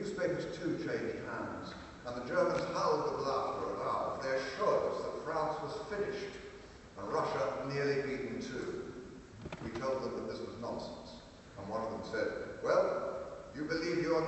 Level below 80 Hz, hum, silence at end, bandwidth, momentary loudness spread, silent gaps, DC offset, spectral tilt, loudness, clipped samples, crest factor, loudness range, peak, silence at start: -62 dBFS; none; 0 s; 8.2 kHz; 14 LU; none; under 0.1%; -5.5 dB/octave; -37 LUFS; under 0.1%; 20 dB; 6 LU; -18 dBFS; 0 s